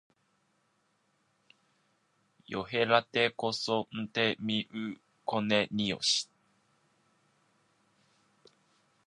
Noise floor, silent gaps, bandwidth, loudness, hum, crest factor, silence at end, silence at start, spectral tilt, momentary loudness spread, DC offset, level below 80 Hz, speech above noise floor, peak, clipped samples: -74 dBFS; none; 11 kHz; -31 LUFS; none; 26 dB; 2.8 s; 2.5 s; -3.5 dB/octave; 13 LU; under 0.1%; -72 dBFS; 43 dB; -8 dBFS; under 0.1%